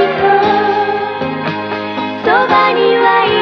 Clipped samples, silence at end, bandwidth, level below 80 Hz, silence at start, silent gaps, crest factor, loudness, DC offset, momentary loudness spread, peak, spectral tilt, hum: under 0.1%; 0 s; 6.2 kHz; -52 dBFS; 0 s; none; 12 dB; -12 LUFS; under 0.1%; 9 LU; 0 dBFS; -6 dB/octave; none